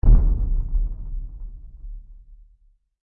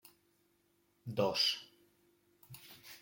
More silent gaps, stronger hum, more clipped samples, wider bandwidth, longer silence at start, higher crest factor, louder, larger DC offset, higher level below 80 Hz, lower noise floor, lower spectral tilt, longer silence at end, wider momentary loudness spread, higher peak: neither; neither; neither; second, 1.4 kHz vs 17 kHz; second, 0.05 s vs 1.05 s; second, 14 dB vs 22 dB; first, -26 LUFS vs -34 LUFS; neither; first, -22 dBFS vs -80 dBFS; second, -58 dBFS vs -75 dBFS; first, -13 dB/octave vs -3.5 dB/octave; first, 0.7 s vs 0.05 s; about the same, 23 LU vs 23 LU; first, -8 dBFS vs -20 dBFS